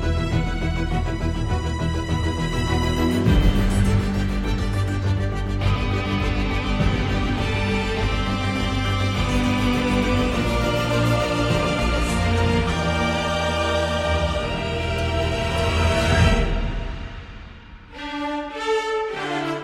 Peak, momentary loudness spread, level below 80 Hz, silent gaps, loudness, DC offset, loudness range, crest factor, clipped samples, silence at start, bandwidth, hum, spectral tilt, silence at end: -6 dBFS; 6 LU; -28 dBFS; none; -22 LUFS; under 0.1%; 2 LU; 16 dB; under 0.1%; 0 s; 15.5 kHz; none; -6 dB/octave; 0 s